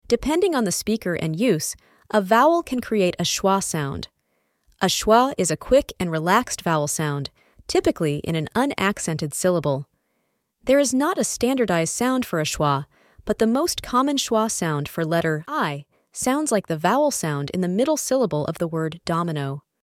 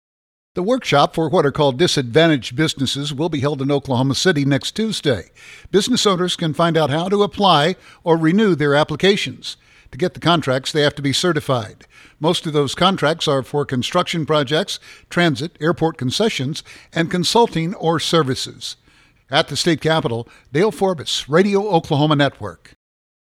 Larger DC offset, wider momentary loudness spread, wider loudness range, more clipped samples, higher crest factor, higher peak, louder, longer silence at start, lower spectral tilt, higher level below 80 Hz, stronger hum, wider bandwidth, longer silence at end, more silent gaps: neither; about the same, 8 LU vs 9 LU; about the same, 2 LU vs 3 LU; neither; about the same, 20 dB vs 18 dB; about the same, -2 dBFS vs 0 dBFS; second, -22 LUFS vs -18 LUFS; second, 0.1 s vs 0.55 s; about the same, -4.5 dB/octave vs -5 dB/octave; about the same, -48 dBFS vs -52 dBFS; neither; about the same, 17 kHz vs 15.5 kHz; second, 0.25 s vs 0.7 s; neither